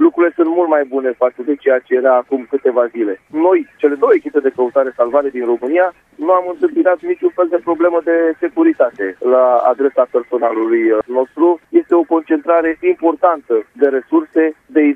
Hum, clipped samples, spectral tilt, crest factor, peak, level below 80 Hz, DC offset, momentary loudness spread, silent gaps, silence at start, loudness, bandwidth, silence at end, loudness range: none; under 0.1%; -7.5 dB/octave; 14 dB; 0 dBFS; -64 dBFS; under 0.1%; 5 LU; none; 0 s; -15 LUFS; 3.6 kHz; 0 s; 1 LU